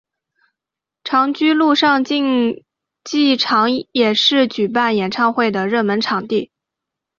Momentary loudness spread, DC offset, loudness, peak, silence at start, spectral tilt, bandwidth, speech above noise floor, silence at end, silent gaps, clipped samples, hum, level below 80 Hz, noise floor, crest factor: 9 LU; under 0.1%; -16 LUFS; -2 dBFS; 1.05 s; -4.5 dB/octave; 7.6 kHz; 69 dB; 0.75 s; none; under 0.1%; none; -62 dBFS; -85 dBFS; 14 dB